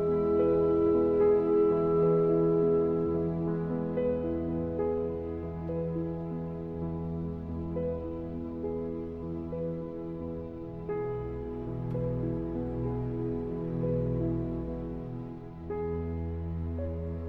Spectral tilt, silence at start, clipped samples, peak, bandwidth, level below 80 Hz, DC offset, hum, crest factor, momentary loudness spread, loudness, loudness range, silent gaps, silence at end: -11.5 dB/octave; 0 s; under 0.1%; -16 dBFS; 4.2 kHz; -48 dBFS; under 0.1%; none; 14 dB; 12 LU; -31 LUFS; 10 LU; none; 0 s